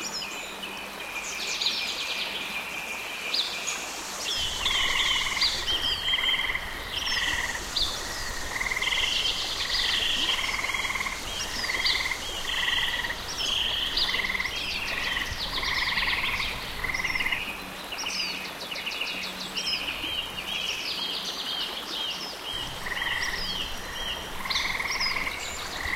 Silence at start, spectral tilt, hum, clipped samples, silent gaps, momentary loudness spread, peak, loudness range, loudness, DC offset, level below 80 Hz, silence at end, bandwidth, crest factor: 0 s; -0.5 dB/octave; none; under 0.1%; none; 8 LU; -12 dBFS; 5 LU; -27 LUFS; under 0.1%; -44 dBFS; 0 s; 16 kHz; 16 dB